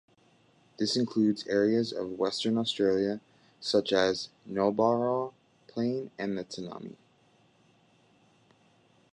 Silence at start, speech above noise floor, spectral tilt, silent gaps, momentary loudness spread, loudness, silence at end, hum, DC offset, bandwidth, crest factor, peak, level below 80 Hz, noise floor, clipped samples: 0.8 s; 36 dB; -5 dB/octave; none; 13 LU; -29 LUFS; 2.2 s; none; under 0.1%; 11 kHz; 20 dB; -12 dBFS; -70 dBFS; -65 dBFS; under 0.1%